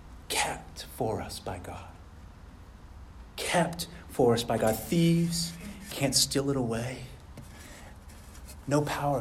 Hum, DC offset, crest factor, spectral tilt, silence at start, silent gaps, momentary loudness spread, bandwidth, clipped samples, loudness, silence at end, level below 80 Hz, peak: none; under 0.1%; 20 dB; -4.5 dB/octave; 0 s; none; 24 LU; 16 kHz; under 0.1%; -29 LUFS; 0 s; -50 dBFS; -10 dBFS